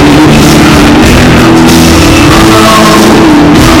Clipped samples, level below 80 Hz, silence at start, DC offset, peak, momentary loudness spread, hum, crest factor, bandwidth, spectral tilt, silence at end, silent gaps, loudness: 30%; -14 dBFS; 0 s; under 0.1%; 0 dBFS; 1 LU; none; 2 dB; over 20 kHz; -5 dB/octave; 0 s; none; -2 LUFS